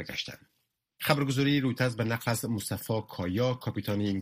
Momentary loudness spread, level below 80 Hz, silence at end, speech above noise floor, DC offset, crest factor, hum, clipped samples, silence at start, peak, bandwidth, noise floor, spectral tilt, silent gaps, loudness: 8 LU; -62 dBFS; 0 s; 48 dB; under 0.1%; 22 dB; none; under 0.1%; 0 s; -8 dBFS; 15.5 kHz; -78 dBFS; -5.5 dB/octave; none; -30 LUFS